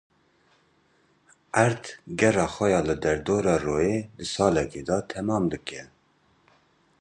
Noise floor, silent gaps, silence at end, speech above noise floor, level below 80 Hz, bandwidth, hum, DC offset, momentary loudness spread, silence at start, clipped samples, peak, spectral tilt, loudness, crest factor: -65 dBFS; none; 1.15 s; 40 dB; -50 dBFS; 10.5 kHz; none; under 0.1%; 11 LU; 1.55 s; under 0.1%; -4 dBFS; -5.5 dB/octave; -25 LUFS; 22 dB